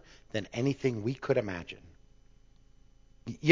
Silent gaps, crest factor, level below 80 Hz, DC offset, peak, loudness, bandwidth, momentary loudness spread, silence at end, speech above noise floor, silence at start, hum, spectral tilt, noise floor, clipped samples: none; 28 dB; -60 dBFS; under 0.1%; -6 dBFS; -33 LUFS; 7.6 kHz; 16 LU; 0 s; 28 dB; 0.1 s; 60 Hz at -65 dBFS; -6.5 dB/octave; -60 dBFS; under 0.1%